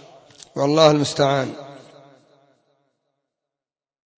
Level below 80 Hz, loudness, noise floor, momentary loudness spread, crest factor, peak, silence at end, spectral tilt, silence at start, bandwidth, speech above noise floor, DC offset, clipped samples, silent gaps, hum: -64 dBFS; -18 LUFS; under -90 dBFS; 22 LU; 22 dB; -2 dBFS; 2.4 s; -5 dB/octave; 0.55 s; 8 kHz; over 73 dB; under 0.1%; under 0.1%; none; none